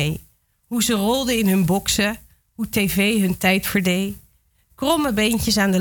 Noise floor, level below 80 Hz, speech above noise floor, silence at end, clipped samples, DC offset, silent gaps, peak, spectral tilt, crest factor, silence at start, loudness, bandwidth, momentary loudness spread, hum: -60 dBFS; -42 dBFS; 40 dB; 0 s; under 0.1%; under 0.1%; none; -4 dBFS; -4 dB/octave; 16 dB; 0 s; -20 LUFS; 19.5 kHz; 10 LU; none